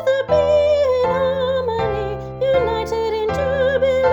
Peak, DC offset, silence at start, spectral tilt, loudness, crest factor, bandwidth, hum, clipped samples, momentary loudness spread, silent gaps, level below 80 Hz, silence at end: -4 dBFS; under 0.1%; 0 s; -6 dB/octave; -18 LUFS; 12 dB; 8.2 kHz; none; under 0.1%; 6 LU; none; -38 dBFS; 0 s